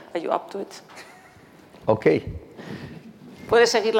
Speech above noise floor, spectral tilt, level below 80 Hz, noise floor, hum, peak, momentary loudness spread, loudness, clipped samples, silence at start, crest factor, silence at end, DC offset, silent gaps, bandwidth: 28 dB; -4.5 dB/octave; -52 dBFS; -50 dBFS; none; -4 dBFS; 25 LU; -22 LUFS; under 0.1%; 0 s; 20 dB; 0 s; under 0.1%; none; 16 kHz